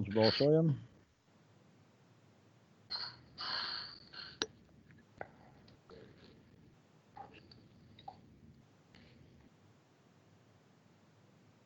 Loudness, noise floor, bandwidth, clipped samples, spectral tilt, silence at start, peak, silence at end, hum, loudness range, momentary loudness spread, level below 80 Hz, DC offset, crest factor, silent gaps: -36 LUFS; -68 dBFS; 7.4 kHz; under 0.1%; -6 dB/octave; 0 s; -14 dBFS; 3.15 s; none; 23 LU; 31 LU; -74 dBFS; under 0.1%; 28 dB; none